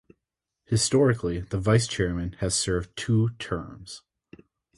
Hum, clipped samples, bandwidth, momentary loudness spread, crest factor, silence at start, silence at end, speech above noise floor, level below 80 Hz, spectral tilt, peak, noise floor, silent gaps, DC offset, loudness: none; under 0.1%; 11.5 kHz; 15 LU; 20 dB; 0.7 s; 0.8 s; 59 dB; -44 dBFS; -5 dB/octave; -6 dBFS; -85 dBFS; none; under 0.1%; -25 LUFS